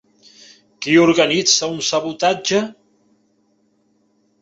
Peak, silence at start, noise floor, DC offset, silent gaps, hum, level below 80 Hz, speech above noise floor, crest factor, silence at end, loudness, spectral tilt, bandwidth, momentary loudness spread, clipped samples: 0 dBFS; 0.8 s; -62 dBFS; under 0.1%; none; none; -62 dBFS; 46 dB; 18 dB; 1.7 s; -16 LUFS; -3 dB/octave; 8 kHz; 8 LU; under 0.1%